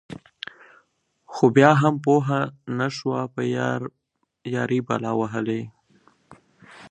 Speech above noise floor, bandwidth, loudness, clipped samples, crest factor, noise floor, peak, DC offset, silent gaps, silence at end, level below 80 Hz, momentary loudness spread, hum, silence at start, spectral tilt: 45 dB; 9 kHz; -22 LUFS; under 0.1%; 24 dB; -66 dBFS; 0 dBFS; under 0.1%; none; 0.05 s; -66 dBFS; 22 LU; none; 0.1 s; -7 dB/octave